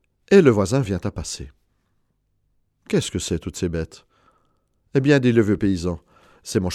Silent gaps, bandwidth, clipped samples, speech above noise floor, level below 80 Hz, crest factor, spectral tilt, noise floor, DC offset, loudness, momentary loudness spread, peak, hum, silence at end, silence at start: none; 13.5 kHz; under 0.1%; 49 dB; -44 dBFS; 20 dB; -6 dB/octave; -68 dBFS; under 0.1%; -21 LUFS; 17 LU; -2 dBFS; 50 Hz at -50 dBFS; 0 s; 0.3 s